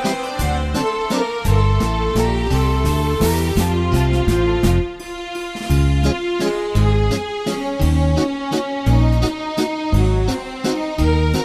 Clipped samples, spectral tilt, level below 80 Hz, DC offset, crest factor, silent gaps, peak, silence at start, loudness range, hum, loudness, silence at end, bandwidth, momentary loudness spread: under 0.1%; -6.5 dB/octave; -22 dBFS; under 0.1%; 14 dB; none; -4 dBFS; 0 s; 1 LU; none; -19 LUFS; 0 s; 14 kHz; 6 LU